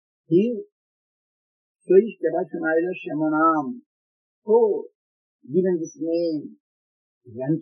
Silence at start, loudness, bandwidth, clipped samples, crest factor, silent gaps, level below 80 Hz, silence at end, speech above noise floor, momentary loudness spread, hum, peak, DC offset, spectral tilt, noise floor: 0.3 s; -22 LUFS; 6.2 kHz; under 0.1%; 20 dB; 0.72-1.75 s, 3.86-4.42 s, 4.95-5.39 s, 6.60-7.21 s; -84 dBFS; 0 s; over 68 dB; 15 LU; none; -4 dBFS; under 0.1%; -7 dB/octave; under -90 dBFS